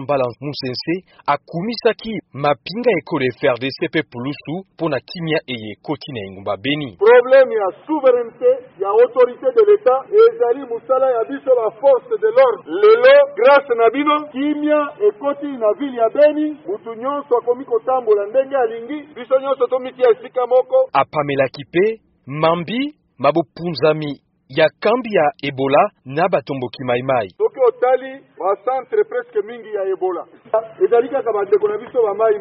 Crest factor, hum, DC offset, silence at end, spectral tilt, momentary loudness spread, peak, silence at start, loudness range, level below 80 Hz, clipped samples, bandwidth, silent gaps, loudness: 16 dB; none; under 0.1%; 0 s; -4 dB/octave; 12 LU; 0 dBFS; 0 s; 7 LU; -62 dBFS; under 0.1%; 5.8 kHz; none; -17 LUFS